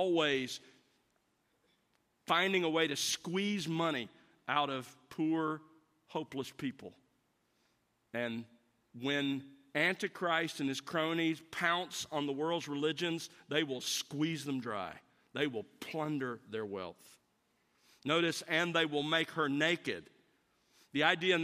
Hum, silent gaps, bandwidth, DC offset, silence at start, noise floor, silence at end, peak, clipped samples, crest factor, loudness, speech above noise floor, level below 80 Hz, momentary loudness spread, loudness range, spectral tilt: none; none; 15 kHz; under 0.1%; 0 s; -77 dBFS; 0 s; -14 dBFS; under 0.1%; 24 dB; -35 LUFS; 42 dB; -82 dBFS; 13 LU; 7 LU; -4 dB/octave